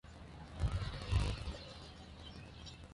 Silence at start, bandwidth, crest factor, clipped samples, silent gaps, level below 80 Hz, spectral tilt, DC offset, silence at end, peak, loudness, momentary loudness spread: 0.05 s; 11.5 kHz; 22 dB; under 0.1%; none; -44 dBFS; -5.5 dB/octave; under 0.1%; 0 s; -20 dBFS; -43 LUFS; 15 LU